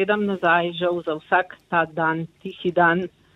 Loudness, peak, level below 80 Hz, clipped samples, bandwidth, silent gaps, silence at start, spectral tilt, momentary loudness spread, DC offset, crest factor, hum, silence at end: -22 LUFS; -4 dBFS; -62 dBFS; under 0.1%; 6.4 kHz; none; 0 s; -7.5 dB/octave; 8 LU; under 0.1%; 18 dB; none; 0.25 s